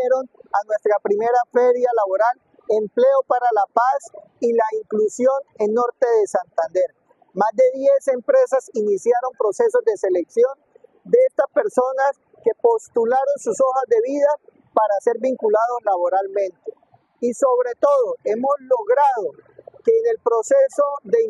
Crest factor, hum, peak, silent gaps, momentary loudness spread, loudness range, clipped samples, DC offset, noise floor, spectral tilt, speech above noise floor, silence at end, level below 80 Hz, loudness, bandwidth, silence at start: 18 dB; none; -2 dBFS; none; 7 LU; 2 LU; under 0.1%; under 0.1%; -43 dBFS; -5 dB/octave; 24 dB; 0 s; -76 dBFS; -19 LUFS; 11 kHz; 0 s